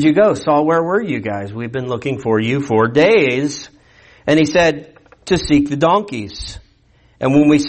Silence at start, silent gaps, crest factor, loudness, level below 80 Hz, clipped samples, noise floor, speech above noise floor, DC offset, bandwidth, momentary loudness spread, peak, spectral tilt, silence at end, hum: 0 s; none; 14 dB; -16 LUFS; -42 dBFS; under 0.1%; -53 dBFS; 38 dB; under 0.1%; 8.8 kHz; 14 LU; -2 dBFS; -6 dB/octave; 0 s; none